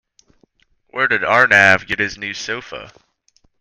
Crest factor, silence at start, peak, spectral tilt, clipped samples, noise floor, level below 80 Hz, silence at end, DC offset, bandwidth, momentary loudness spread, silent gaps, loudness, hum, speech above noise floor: 18 dB; 0.95 s; 0 dBFS; -3.5 dB/octave; under 0.1%; -60 dBFS; -54 dBFS; 0.7 s; under 0.1%; 15 kHz; 20 LU; none; -15 LUFS; none; 43 dB